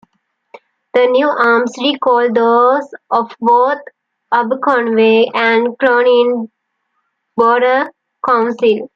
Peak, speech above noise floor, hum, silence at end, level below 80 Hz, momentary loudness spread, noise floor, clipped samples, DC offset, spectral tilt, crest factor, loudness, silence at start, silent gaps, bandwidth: -2 dBFS; 56 dB; none; 0.1 s; -66 dBFS; 8 LU; -68 dBFS; under 0.1%; under 0.1%; -5 dB/octave; 12 dB; -13 LUFS; 0.95 s; none; 7.4 kHz